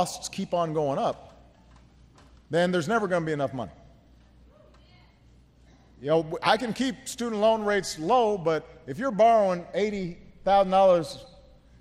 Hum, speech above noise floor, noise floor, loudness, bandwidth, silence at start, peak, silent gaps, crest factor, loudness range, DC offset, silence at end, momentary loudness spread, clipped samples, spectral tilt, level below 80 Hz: none; 32 dB; -57 dBFS; -25 LUFS; 15.5 kHz; 0 s; -6 dBFS; none; 20 dB; 7 LU; under 0.1%; 0.55 s; 14 LU; under 0.1%; -5 dB/octave; -56 dBFS